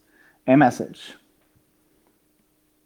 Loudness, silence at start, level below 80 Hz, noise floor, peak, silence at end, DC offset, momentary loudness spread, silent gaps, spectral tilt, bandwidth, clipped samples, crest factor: -20 LUFS; 0.45 s; -70 dBFS; -65 dBFS; -2 dBFS; 1.9 s; under 0.1%; 24 LU; none; -7 dB/octave; 14.5 kHz; under 0.1%; 22 dB